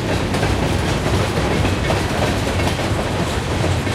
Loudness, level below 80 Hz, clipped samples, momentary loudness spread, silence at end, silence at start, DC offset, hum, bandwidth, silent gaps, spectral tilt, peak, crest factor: -19 LUFS; -28 dBFS; under 0.1%; 2 LU; 0 s; 0 s; under 0.1%; none; 15.5 kHz; none; -5.5 dB/octave; -4 dBFS; 14 dB